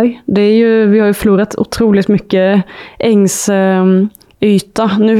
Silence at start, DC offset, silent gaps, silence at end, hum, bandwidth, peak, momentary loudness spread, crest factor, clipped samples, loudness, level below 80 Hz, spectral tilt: 0 s; under 0.1%; none; 0 s; none; 15 kHz; 0 dBFS; 6 LU; 10 dB; under 0.1%; -11 LUFS; -42 dBFS; -6 dB/octave